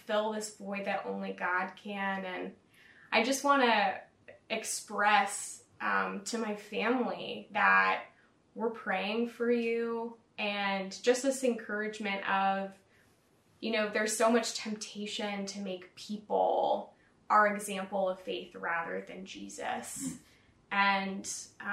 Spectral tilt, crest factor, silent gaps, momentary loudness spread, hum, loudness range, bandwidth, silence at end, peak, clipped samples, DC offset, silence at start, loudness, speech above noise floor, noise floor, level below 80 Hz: -3 dB/octave; 22 dB; none; 14 LU; none; 4 LU; 16 kHz; 0 s; -12 dBFS; under 0.1%; under 0.1%; 0.05 s; -32 LUFS; 35 dB; -67 dBFS; -78 dBFS